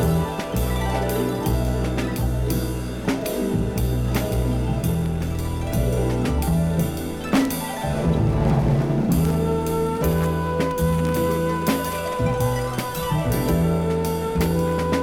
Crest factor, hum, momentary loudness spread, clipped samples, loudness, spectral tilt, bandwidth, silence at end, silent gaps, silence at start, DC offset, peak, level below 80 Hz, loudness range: 16 dB; none; 5 LU; under 0.1%; -23 LUFS; -6.5 dB/octave; 18 kHz; 0 s; none; 0 s; under 0.1%; -6 dBFS; -30 dBFS; 3 LU